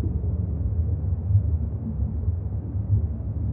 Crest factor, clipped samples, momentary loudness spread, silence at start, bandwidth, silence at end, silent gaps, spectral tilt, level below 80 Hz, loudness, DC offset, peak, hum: 14 dB; under 0.1%; 6 LU; 0 s; 1.7 kHz; 0 s; none; -15 dB/octave; -32 dBFS; -27 LUFS; under 0.1%; -10 dBFS; none